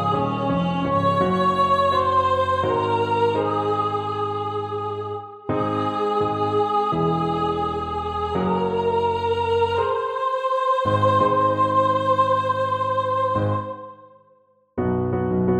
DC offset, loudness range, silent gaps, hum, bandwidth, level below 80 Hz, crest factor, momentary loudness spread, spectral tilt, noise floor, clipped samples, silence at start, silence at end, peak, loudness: under 0.1%; 4 LU; none; none; 10.5 kHz; -50 dBFS; 14 dB; 8 LU; -7.5 dB/octave; -59 dBFS; under 0.1%; 0 s; 0 s; -8 dBFS; -21 LUFS